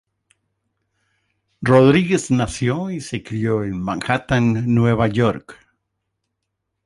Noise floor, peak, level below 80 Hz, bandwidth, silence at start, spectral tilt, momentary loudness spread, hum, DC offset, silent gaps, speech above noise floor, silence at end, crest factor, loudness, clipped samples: -77 dBFS; -2 dBFS; -46 dBFS; 11.5 kHz; 1.6 s; -6.5 dB/octave; 12 LU; none; under 0.1%; none; 59 dB; 1.35 s; 18 dB; -18 LUFS; under 0.1%